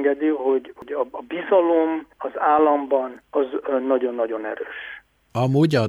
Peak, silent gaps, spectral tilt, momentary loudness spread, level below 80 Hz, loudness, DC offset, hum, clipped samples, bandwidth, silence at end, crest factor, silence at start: -6 dBFS; none; -8 dB/octave; 13 LU; -64 dBFS; -22 LUFS; under 0.1%; none; under 0.1%; 11.5 kHz; 0 s; 16 dB; 0 s